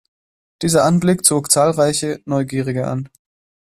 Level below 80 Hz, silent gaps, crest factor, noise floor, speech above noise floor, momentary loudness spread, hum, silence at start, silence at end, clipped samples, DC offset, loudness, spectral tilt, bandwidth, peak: -52 dBFS; none; 18 dB; under -90 dBFS; over 74 dB; 11 LU; none; 0.6 s; 0.65 s; under 0.1%; under 0.1%; -16 LUFS; -4.5 dB/octave; 15 kHz; 0 dBFS